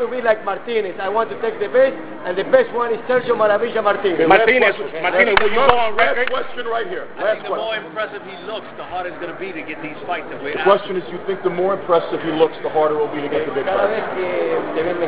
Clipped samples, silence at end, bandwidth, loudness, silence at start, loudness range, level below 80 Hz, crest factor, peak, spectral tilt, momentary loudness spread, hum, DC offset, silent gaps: under 0.1%; 0 s; 4 kHz; -19 LUFS; 0 s; 9 LU; -50 dBFS; 18 dB; 0 dBFS; -8 dB/octave; 14 LU; none; 1%; none